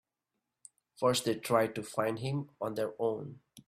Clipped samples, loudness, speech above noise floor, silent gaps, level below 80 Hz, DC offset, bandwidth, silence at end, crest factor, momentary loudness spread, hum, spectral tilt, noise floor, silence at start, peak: under 0.1%; -33 LUFS; 54 dB; none; -70 dBFS; under 0.1%; 16 kHz; 0.05 s; 20 dB; 8 LU; none; -5 dB/octave; -87 dBFS; 1 s; -14 dBFS